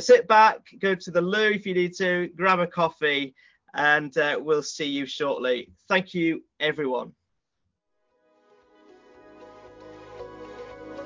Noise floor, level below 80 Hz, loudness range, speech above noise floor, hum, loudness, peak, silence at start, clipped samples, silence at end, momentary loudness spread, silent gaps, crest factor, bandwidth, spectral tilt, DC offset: -79 dBFS; -68 dBFS; 11 LU; 56 dB; none; -23 LUFS; -8 dBFS; 0 s; under 0.1%; 0 s; 21 LU; none; 18 dB; 7.6 kHz; -4.5 dB/octave; under 0.1%